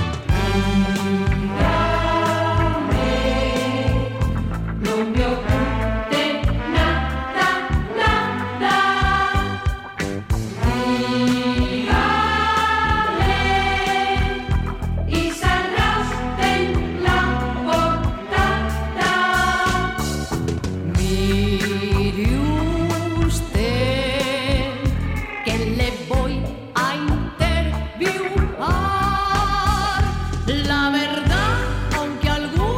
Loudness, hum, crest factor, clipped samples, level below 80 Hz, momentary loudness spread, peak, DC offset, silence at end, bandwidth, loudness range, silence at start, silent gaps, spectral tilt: -20 LUFS; none; 16 dB; under 0.1%; -28 dBFS; 6 LU; -4 dBFS; under 0.1%; 0 s; 16.5 kHz; 3 LU; 0 s; none; -5.5 dB/octave